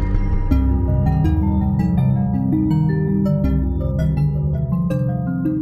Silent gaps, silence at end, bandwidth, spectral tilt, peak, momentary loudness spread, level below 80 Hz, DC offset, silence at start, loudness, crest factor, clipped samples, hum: none; 0 s; 12.5 kHz; -10.5 dB/octave; -6 dBFS; 4 LU; -24 dBFS; under 0.1%; 0 s; -19 LUFS; 12 dB; under 0.1%; none